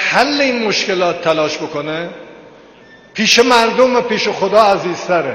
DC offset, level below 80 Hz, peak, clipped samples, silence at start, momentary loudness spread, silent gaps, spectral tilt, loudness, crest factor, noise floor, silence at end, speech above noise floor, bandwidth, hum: under 0.1%; -54 dBFS; 0 dBFS; under 0.1%; 0 s; 11 LU; none; -3 dB/octave; -13 LUFS; 14 dB; -42 dBFS; 0 s; 28 dB; 16.5 kHz; none